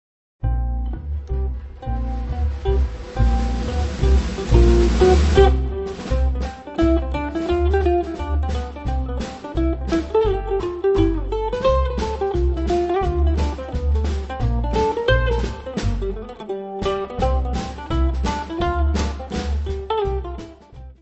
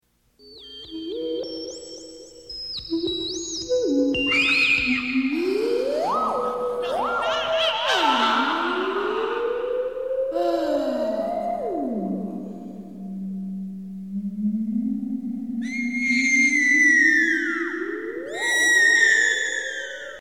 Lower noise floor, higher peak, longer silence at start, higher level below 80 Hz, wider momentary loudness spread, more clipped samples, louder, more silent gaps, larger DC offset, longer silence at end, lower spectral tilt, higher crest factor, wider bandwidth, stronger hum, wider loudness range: second, -40 dBFS vs -54 dBFS; first, 0 dBFS vs -6 dBFS; about the same, 0.4 s vs 0.45 s; first, -22 dBFS vs -56 dBFS; second, 11 LU vs 17 LU; neither; about the same, -22 LUFS vs -21 LUFS; neither; second, under 0.1% vs 0.2%; about the same, 0.1 s vs 0 s; first, -7 dB/octave vs -3 dB/octave; about the same, 20 dB vs 16 dB; second, 8.2 kHz vs 16.5 kHz; neither; second, 6 LU vs 12 LU